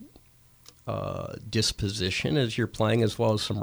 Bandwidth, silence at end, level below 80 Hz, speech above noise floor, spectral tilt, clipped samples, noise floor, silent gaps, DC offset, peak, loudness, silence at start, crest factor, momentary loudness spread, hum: over 20 kHz; 0 s; -50 dBFS; 30 dB; -5 dB/octave; under 0.1%; -57 dBFS; none; under 0.1%; -12 dBFS; -27 LUFS; 0 s; 16 dB; 10 LU; none